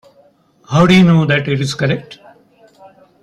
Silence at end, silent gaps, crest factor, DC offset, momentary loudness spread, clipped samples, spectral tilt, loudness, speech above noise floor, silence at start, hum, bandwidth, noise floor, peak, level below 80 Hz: 1.1 s; none; 14 dB; under 0.1%; 10 LU; under 0.1%; -6.5 dB/octave; -13 LUFS; 39 dB; 0.7 s; none; 11.5 kHz; -51 dBFS; 0 dBFS; -46 dBFS